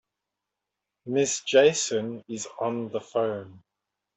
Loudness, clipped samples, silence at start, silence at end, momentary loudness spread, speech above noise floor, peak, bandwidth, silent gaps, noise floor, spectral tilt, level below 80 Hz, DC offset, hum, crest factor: -26 LUFS; under 0.1%; 1.05 s; 0.6 s; 16 LU; 60 dB; -8 dBFS; 8.4 kHz; none; -86 dBFS; -3 dB/octave; -74 dBFS; under 0.1%; none; 20 dB